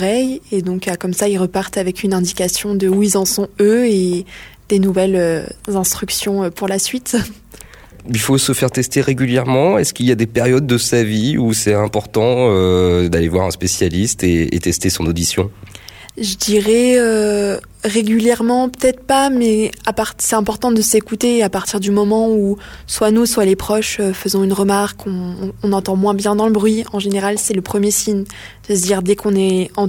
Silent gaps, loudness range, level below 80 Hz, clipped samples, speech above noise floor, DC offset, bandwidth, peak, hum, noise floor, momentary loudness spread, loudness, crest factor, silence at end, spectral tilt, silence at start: none; 3 LU; -40 dBFS; under 0.1%; 24 dB; under 0.1%; 17.5 kHz; -2 dBFS; none; -39 dBFS; 7 LU; -16 LUFS; 14 dB; 0 s; -4.5 dB/octave; 0 s